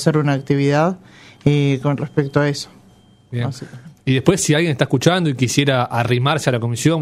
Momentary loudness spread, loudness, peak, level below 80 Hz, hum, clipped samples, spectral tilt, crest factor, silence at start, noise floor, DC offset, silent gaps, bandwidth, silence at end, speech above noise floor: 11 LU; -18 LUFS; 0 dBFS; -52 dBFS; none; under 0.1%; -5.5 dB/octave; 18 dB; 0 s; -49 dBFS; under 0.1%; none; 15 kHz; 0 s; 32 dB